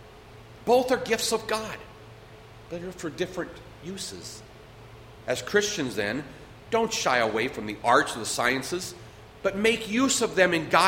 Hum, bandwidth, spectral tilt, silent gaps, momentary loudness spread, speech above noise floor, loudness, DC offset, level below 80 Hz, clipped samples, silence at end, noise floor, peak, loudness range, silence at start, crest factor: none; 16.5 kHz; -3 dB/octave; none; 18 LU; 22 dB; -26 LUFS; under 0.1%; -56 dBFS; under 0.1%; 0 s; -48 dBFS; -4 dBFS; 10 LU; 0 s; 24 dB